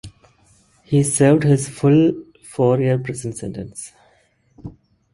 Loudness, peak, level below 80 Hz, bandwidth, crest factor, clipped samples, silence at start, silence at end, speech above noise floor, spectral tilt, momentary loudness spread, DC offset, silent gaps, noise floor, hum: -18 LUFS; -2 dBFS; -52 dBFS; 11.5 kHz; 18 dB; under 0.1%; 0.05 s; 0.45 s; 42 dB; -6.5 dB/octave; 24 LU; under 0.1%; none; -59 dBFS; none